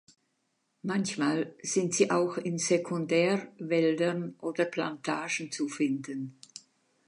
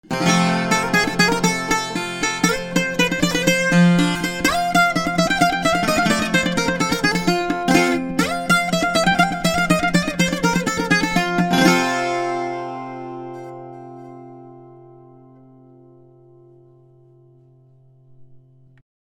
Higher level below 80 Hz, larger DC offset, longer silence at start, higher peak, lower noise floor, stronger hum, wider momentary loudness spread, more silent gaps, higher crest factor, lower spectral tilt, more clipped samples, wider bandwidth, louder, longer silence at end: second, -82 dBFS vs -44 dBFS; neither; first, 0.85 s vs 0.1 s; second, -10 dBFS vs 0 dBFS; first, -77 dBFS vs -51 dBFS; neither; second, 12 LU vs 15 LU; neither; about the same, 20 dB vs 20 dB; about the same, -4.5 dB/octave vs -4 dB/octave; neither; second, 11 kHz vs 17 kHz; second, -30 LUFS vs -18 LUFS; second, 0.5 s vs 0.7 s